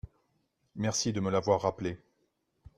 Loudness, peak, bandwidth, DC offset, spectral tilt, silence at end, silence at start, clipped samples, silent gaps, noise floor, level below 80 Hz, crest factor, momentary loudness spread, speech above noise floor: -31 LUFS; -12 dBFS; 13.5 kHz; under 0.1%; -4.5 dB/octave; 0.8 s; 0.05 s; under 0.1%; none; -76 dBFS; -60 dBFS; 22 dB; 15 LU; 46 dB